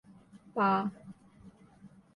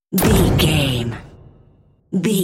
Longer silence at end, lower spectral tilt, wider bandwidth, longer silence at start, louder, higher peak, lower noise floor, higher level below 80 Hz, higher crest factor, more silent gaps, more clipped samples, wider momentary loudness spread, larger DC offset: first, 0.3 s vs 0 s; first, -8 dB/octave vs -5 dB/octave; second, 10.5 kHz vs 16.5 kHz; first, 0.35 s vs 0.1 s; second, -31 LUFS vs -17 LUFS; second, -18 dBFS vs -4 dBFS; first, -57 dBFS vs -53 dBFS; second, -72 dBFS vs -30 dBFS; about the same, 18 dB vs 16 dB; neither; neither; first, 25 LU vs 12 LU; neither